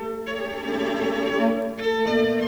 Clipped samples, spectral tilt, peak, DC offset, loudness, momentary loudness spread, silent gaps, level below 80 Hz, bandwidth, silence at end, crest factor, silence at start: under 0.1%; -5 dB/octave; -10 dBFS; under 0.1%; -24 LUFS; 8 LU; none; -56 dBFS; over 20 kHz; 0 s; 14 dB; 0 s